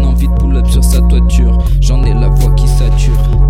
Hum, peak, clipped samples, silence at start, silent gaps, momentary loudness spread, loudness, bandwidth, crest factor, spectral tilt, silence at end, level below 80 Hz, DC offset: none; 0 dBFS; under 0.1%; 0 s; none; 2 LU; -11 LUFS; 14.5 kHz; 8 dB; -6.5 dB/octave; 0 s; -8 dBFS; under 0.1%